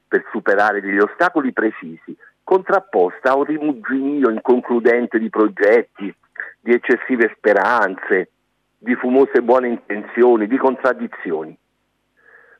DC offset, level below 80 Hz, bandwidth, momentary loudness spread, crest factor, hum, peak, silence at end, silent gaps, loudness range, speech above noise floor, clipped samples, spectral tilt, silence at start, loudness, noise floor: under 0.1%; -70 dBFS; 7.2 kHz; 15 LU; 14 dB; none; -4 dBFS; 1.05 s; none; 2 LU; 51 dB; under 0.1%; -7 dB/octave; 0.1 s; -17 LUFS; -68 dBFS